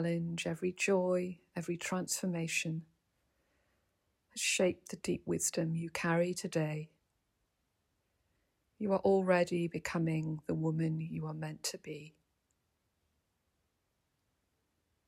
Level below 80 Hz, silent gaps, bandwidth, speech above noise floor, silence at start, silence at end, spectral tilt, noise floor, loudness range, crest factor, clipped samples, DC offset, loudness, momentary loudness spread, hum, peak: -72 dBFS; none; 16 kHz; 47 dB; 0 s; 3 s; -5 dB/octave; -81 dBFS; 7 LU; 20 dB; under 0.1%; under 0.1%; -35 LUFS; 11 LU; none; -18 dBFS